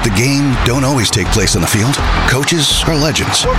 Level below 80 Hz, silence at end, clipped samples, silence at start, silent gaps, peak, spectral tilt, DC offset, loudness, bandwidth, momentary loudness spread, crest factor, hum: -22 dBFS; 0 s; under 0.1%; 0 s; none; 0 dBFS; -4 dB/octave; under 0.1%; -12 LUFS; 16.5 kHz; 2 LU; 12 dB; none